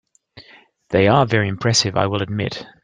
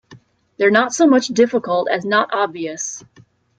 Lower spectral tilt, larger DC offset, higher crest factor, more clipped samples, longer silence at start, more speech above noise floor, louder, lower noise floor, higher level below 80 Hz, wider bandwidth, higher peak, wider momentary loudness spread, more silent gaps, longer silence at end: about the same, -4.5 dB/octave vs -3.5 dB/octave; neither; about the same, 20 dB vs 18 dB; neither; first, 0.35 s vs 0.1 s; about the same, 30 dB vs 31 dB; about the same, -18 LUFS vs -17 LUFS; about the same, -48 dBFS vs -47 dBFS; first, -52 dBFS vs -64 dBFS; first, 10.5 kHz vs 9.4 kHz; about the same, 0 dBFS vs 0 dBFS; about the same, 9 LU vs 11 LU; neither; second, 0.15 s vs 0.6 s